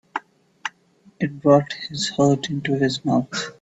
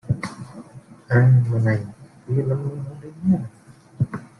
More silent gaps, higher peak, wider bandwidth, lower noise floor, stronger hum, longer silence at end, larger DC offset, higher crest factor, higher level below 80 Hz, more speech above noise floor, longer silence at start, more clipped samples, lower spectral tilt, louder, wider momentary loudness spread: neither; first, -2 dBFS vs -6 dBFS; second, 8.4 kHz vs 10.5 kHz; first, -56 dBFS vs -44 dBFS; neither; about the same, 0.1 s vs 0.15 s; neither; about the same, 20 dB vs 16 dB; second, -60 dBFS vs -54 dBFS; first, 35 dB vs 24 dB; about the same, 0.15 s vs 0.05 s; neither; second, -5.5 dB/octave vs -9 dB/octave; about the same, -21 LUFS vs -21 LUFS; second, 16 LU vs 22 LU